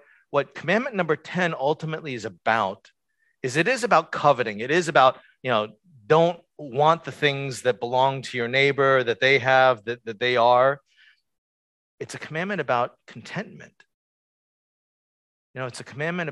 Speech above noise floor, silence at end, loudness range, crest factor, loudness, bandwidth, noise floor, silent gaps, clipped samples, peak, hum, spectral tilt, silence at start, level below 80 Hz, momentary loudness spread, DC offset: 37 dB; 0 s; 11 LU; 20 dB; -22 LUFS; 12 kHz; -59 dBFS; 11.38-11.98 s, 13.94-15.54 s; under 0.1%; -4 dBFS; none; -5 dB/octave; 0.35 s; -70 dBFS; 16 LU; under 0.1%